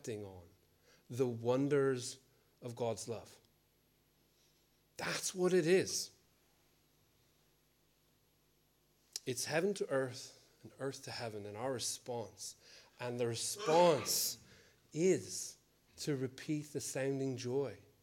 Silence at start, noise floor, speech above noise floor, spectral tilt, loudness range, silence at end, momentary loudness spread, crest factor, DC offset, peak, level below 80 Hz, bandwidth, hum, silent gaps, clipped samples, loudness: 0.05 s; -74 dBFS; 37 dB; -4 dB/octave; 8 LU; 0.2 s; 16 LU; 22 dB; under 0.1%; -18 dBFS; -82 dBFS; 17 kHz; none; none; under 0.1%; -37 LUFS